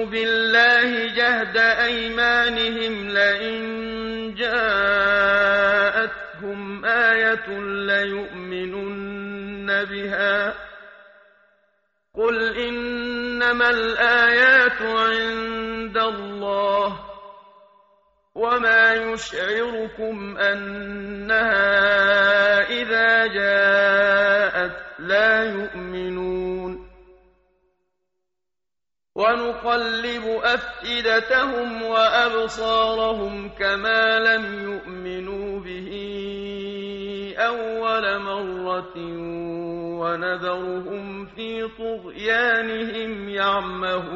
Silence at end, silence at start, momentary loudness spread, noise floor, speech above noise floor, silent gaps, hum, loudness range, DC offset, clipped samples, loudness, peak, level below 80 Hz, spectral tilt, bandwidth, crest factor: 0 s; 0 s; 15 LU; under -90 dBFS; over 69 dB; none; none; 9 LU; under 0.1%; under 0.1%; -20 LUFS; -4 dBFS; -52 dBFS; -0.5 dB/octave; 7.6 kHz; 18 dB